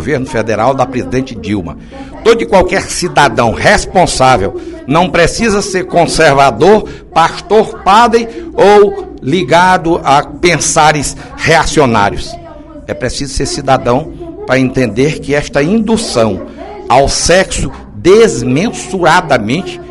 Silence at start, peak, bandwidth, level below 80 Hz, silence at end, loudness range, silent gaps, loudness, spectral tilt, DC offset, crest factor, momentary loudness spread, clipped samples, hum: 0 s; 0 dBFS; 12 kHz; -28 dBFS; 0 s; 4 LU; none; -10 LUFS; -4.5 dB/octave; under 0.1%; 10 dB; 12 LU; 1%; none